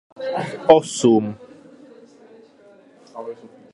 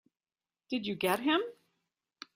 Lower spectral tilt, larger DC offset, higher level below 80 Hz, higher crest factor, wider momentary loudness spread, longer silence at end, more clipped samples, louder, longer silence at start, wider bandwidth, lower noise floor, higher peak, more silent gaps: about the same, -5 dB/octave vs -4.5 dB/octave; neither; first, -64 dBFS vs -76 dBFS; about the same, 22 dB vs 20 dB; first, 25 LU vs 14 LU; second, 0.25 s vs 0.85 s; neither; first, -18 LUFS vs -32 LUFS; second, 0.2 s vs 0.7 s; second, 11.5 kHz vs 16 kHz; second, -50 dBFS vs under -90 dBFS; first, 0 dBFS vs -14 dBFS; neither